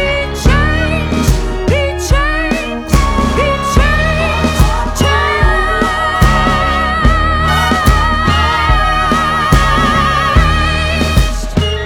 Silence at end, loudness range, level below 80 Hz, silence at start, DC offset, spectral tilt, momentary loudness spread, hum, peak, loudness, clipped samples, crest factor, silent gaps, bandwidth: 0 s; 2 LU; -16 dBFS; 0 s; under 0.1%; -5 dB/octave; 4 LU; none; 0 dBFS; -12 LUFS; under 0.1%; 12 dB; none; 18 kHz